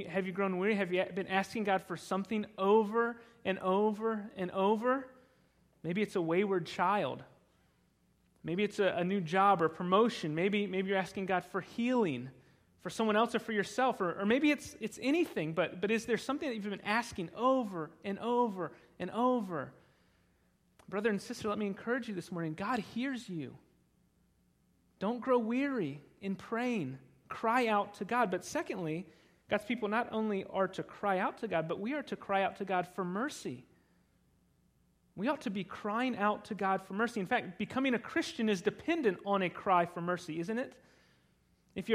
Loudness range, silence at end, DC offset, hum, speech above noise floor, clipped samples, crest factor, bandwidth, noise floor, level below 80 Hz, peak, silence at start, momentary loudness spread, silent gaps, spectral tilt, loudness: 6 LU; 0 s; under 0.1%; none; 38 dB; under 0.1%; 20 dB; 15.5 kHz; -72 dBFS; -72 dBFS; -14 dBFS; 0 s; 11 LU; none; -5.5 dB/octave; -34 LUFS